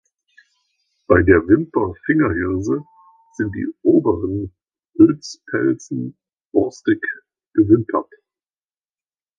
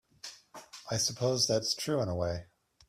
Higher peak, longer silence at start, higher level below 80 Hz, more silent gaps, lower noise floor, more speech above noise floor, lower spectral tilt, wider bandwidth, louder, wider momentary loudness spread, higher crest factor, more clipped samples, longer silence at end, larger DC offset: first, 0 dBFS vs -16 dBFS; first, 1.1 s vs 0.25 s; first, -40 dBFS vs -60 dBFS; first, 6.45-6.50 s vs none; first, under -90 dBFS vs -52 dBFS; first, over 73 dB vs 20 dB; first, -7.5 dB/octave vs -3.5 dB/octave; second, 7.4 kHz vs 16 kHz; first, -18 LUFS vs -31 LUFS; second, 13 LU vs 19 LU; about the same, 20 dB vs 18 dB; neither; first, 1.35 s vs 0.45 s; neither